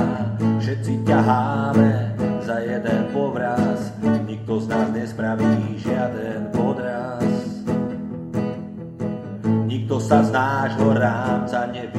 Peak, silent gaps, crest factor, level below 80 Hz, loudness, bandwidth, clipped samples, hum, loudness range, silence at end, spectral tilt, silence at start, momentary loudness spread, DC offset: -2 dBFS; none; 20 dB; -56 dBFS; -22 LUFS; 11.5 kHz; under 0.1%; none; 4 LU; 0 s; -8 dB/octave; 0 s; 9 LU; under 0.1%